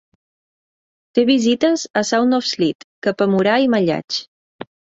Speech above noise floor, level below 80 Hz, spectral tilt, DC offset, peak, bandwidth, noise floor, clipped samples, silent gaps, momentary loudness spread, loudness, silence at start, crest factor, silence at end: over 73 dB; -62 dBFS; -4.5 dB/octave; under 0.1%; -2 dBFS; 8 kHz; under -90 dBFS; under 0.1%; 1.90-1.94 s, 2.75-3.02 s, 4.04-4.08 s, 4.28-4.59 s; 10 LU; -18 LUFS; 1.15 s; 16 dB; 0.3 s